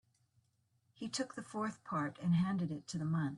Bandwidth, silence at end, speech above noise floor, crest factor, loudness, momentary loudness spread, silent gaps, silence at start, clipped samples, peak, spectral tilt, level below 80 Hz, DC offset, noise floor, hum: 11 kHz; 0 s; 40 dB; 14 dB; -38 LUFS; 8 LU; none; 1 s; under 0.1%; -24 dBFS; -6 dB/octave; -74 dBFS; under 0.1%; -77 dBFS; none